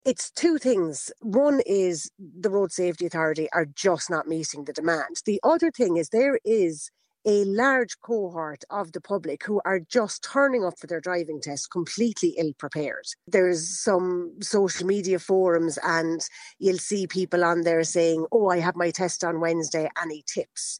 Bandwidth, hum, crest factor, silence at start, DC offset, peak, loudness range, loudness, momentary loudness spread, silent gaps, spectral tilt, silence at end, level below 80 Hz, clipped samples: 11 kHz; none; 18 dB; 0.05 s; under 0.1%; -8 dBFS; 3 LU; -25 LUFS; 9 LU; none; -4 dB/octave; 0 s; -74 dBFS; under 0.1%